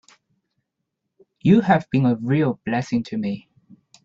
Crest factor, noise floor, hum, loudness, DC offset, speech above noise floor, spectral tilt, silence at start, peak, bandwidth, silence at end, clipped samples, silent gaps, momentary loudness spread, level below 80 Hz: 20 dB; -79 dBFS; none; -21 LUFS; under 0.1%; 60 dB; -8 dB/octave; 1.45 s; -4 dBFS; 7.6 kHz; 0.65 s; under 0.1%; none; 11 LU; -60 dBFS